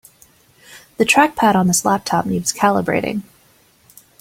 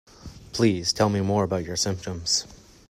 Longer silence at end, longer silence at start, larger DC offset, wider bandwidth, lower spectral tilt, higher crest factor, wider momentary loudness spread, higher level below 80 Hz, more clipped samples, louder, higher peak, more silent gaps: first, 1 s vs 0.35 s; first, 0.7 s vs 0.2 s; neither; about the same, 16.5 kHz vs 15.5 kHz; about the same, -4 dB/octave vs -4 dB/octave; about the same, 18 dB vs 20 dB; about the same, 10 LU vs 11 LU; about the same, -52 dBFS vs -52 dBFS; neither; first, -16 LUFS vs -24 LUFS; first, 0 dBFS vs -6 dBFS; neither